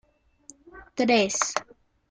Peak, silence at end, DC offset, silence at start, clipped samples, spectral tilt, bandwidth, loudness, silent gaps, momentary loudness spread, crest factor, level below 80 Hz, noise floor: -6 dBFS; 0.5 s; under 0.1%; 0.75 s; under 0.1%; -2.5 dB/octave; 10 kHz; -24 LUFS; none; 12 LU; 22 dB; -62 dBFS; -54 dBFS